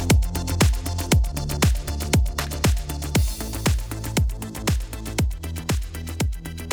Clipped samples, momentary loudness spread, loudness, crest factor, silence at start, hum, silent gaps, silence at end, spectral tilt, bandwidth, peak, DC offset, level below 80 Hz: under 0.1%; 6 LU; -24 LUFS; 18 dB; 0 s; none; none; 0 s; -4.5 dB/octave; over 20 kHz; -4 dBFS; under 0.1%; -26 dBFS